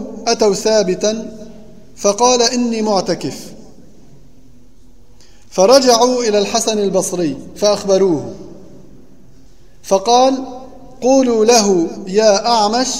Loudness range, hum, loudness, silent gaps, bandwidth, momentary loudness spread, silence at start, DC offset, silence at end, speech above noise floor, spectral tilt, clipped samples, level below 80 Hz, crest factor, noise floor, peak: 5 LU; none; -14 LUFS; none; 16 kHz; 14 LU; 0 s; 1%; 0 s; 33 dB; -3.5 dB/octave; under 0.1%; -48 dBFS; 16 dB; -47 dBFS; 0 dBFS